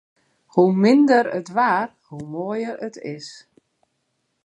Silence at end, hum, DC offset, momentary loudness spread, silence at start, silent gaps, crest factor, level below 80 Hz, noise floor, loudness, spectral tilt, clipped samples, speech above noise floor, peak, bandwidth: 1.1 s; none; under 0.1%; 18 LU; 0.55 s; none; 18 dB; -70 dBFS; -72 dBFS; -20 LUFS; -7 dB/octave; under 0.1%; 53 dB; -4 dBFS; 9.4 kHz